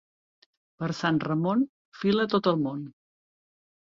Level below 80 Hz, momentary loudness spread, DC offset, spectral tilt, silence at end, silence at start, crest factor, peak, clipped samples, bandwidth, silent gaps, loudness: -66 dBFS; 11 LU; under 0.1%; -7 dB/octave; 1.1 s; 0.8 s; 18 dB; -12 dBFS; under 0.1%; 7.6 kHz; 1.69-1.92 s; -27 LUFS